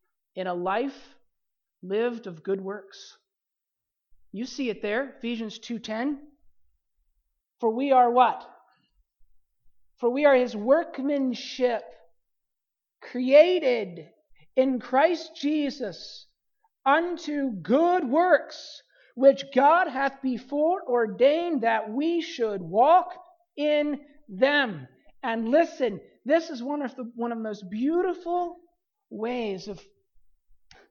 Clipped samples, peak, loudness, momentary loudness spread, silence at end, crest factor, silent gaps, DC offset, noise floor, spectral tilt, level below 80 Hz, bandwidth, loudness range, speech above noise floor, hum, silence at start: under 0.1%; -6 dBFS; -25 LUFS; 17 LU; 1.1 s; 20 dB; none; under 0.1%; -86 dBFS; -5.5 dB/octave; -68 dBFS; 7 kHz; 10 LU; 62 dB; none; 0.35 s